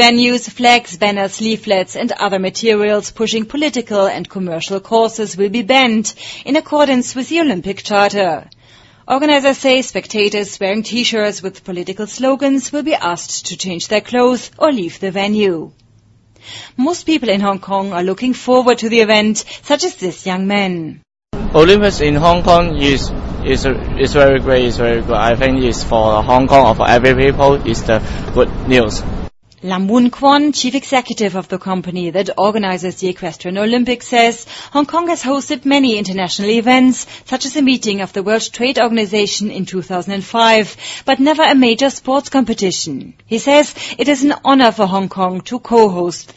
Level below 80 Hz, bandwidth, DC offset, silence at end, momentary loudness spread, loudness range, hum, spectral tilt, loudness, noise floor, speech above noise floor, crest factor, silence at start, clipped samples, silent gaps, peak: -30 dBFS; 8 kHz; under 0.1%; 0.15 s; 11 LU; 5 LU; none; -4.5 dB/octave; -14 LUFS; -49 dBFS; 35 dB; 14 dB; 0 s; 0.1%; none; 0 dBFS